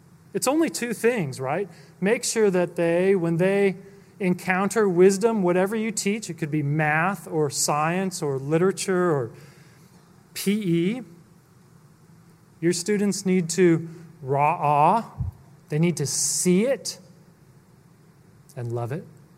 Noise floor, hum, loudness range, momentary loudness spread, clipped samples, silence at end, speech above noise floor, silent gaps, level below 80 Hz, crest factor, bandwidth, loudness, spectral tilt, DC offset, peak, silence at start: -54 dBFS; none; 5 LU; 13 LU; under 0.1%; 0.3 s; 31 dB; none; -58 dBFS; 18 dB; 16 kHz; -23 LUFS; -5 dB/octave; under 0.1%; -6 dBFS; 0.35 s